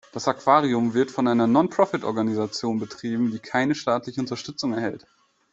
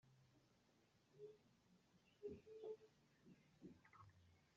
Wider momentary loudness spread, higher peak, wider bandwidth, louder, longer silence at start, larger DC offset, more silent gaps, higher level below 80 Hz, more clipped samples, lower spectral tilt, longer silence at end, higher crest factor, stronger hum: about the same, 10 LU vs 11 LU; first, -4 dBFS vs -44 dBFS; about the same, 7.8 kHz vs 7.2 kHz; first, -24 LUFS vs -61 LUFS; about the same, 0.15 s vs 0.05 s; neither; neither; first, -64 dBFS vs -88 dBFS; neither; about the same, -5.5 dB/octave vs -6 dB/octave; first, 0.55 s vs 0 s; about the same, 20 dB vs 20 dB; neither